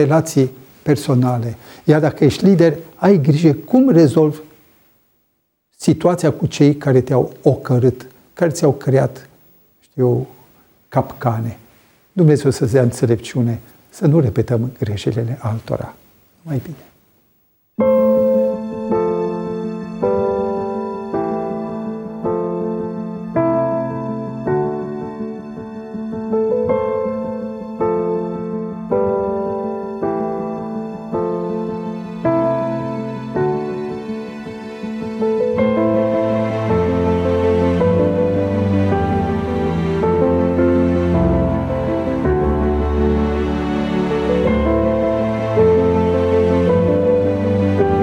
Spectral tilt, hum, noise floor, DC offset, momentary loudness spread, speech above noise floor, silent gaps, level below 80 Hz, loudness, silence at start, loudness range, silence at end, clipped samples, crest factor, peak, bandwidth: -8 dB/octave; none; -67 dBFS; under 0.1%; 12 LU; 52 dB; none; -34 dBFS; -18 LUFS; 0 s; 6 LU; 0 s; under 0.1%; 16 dB; 0 dBFS; 16.5 kHz